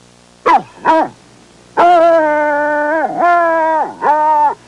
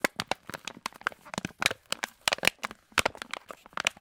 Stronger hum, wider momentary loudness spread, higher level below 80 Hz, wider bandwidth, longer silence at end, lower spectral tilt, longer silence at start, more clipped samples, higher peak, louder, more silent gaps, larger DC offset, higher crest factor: first, 60 Hz at -50 dBFS vs none; second, 6 LU vs 13 LU; about the same, -56 dBFS vs -60 dBFS; second, 11 kHz vs 18 kHz; about the same, 0.15 s vs 0.1 s; first, -5 dB/octave vs -1.5 dB/octave; first, 0.45 s vs 0.05 s; neither; about the same, -2 dBFS vs 0 dBFS; first, -12 LUFS vs -31 LUFS; neither; first, 0.1% vs under 0.1%; second, 10 dB vs 34 dB